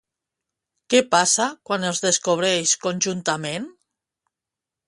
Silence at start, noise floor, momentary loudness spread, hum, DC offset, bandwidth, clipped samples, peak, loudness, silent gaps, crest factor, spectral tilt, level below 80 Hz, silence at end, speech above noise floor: 0.9 s; -87 dBFS; 9 LU; none; under 0.1%; 11.5 kHz; under 0.1%; -2 dBFS; -20 LUFS; none; 20 dB; -2 dB/octave; -70 dBFS; 1.15 s; 66 dB